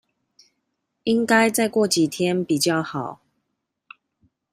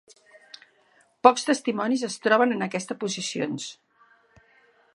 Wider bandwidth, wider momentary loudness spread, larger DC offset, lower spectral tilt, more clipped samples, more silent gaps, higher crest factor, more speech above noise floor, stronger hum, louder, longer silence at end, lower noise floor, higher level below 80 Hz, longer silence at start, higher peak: first, 15.5 kHz vs 11.5 kHz; about the same, 13 LU vs 11 LU; neither; about the same, -4 dB/octave vs -3.5 dB/octave; neither; neither; second, 20 dB vs 26 dB; first, 57 dB vs 39 dB; neither; first, -21 LUFS vs -24 LUFS; first, 1.4 s vs 1.2 s; first, -78 dBFS vs -62 dBFS; first, -66 dBFS vs -76 dBFS; second, 1.05 s vs 1.25 s; about the same, -2 dBFS vs -2 dBFS